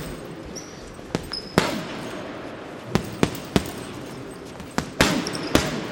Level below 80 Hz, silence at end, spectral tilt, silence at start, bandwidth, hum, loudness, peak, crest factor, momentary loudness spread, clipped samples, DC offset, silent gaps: -44 dBFS; 0 s; -4.5 dB/octave; 0 s; 17 kHz; none; -26 LUFS; 0 dBFS; 26 dB; 15 LU; under 0.1%; under 0.1%; none